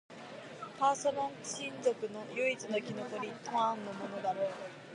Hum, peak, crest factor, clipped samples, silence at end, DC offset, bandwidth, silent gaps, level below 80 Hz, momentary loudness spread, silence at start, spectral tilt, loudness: none; -18 dBFS; 20 dB; under 0.1%; 0 s; under 0.1%; 11 kHz; none; -84 dBFS; 14 LU; 0.1 s; -3.5 dB/octave; -36 LUFS